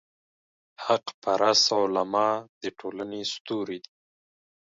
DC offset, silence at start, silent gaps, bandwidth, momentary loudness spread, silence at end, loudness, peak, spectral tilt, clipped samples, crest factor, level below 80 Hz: under 0.1%; 0.8 s; 1.14-1.22 s, 2.49-2.61 s, 3.40-3.45 s; 7.8 kHz; 15 LU; 0.9 s; -26 LUFS; -8 dBFS; -2.5 dB/octave; under 0.1%; 20 dB; -74 dBFS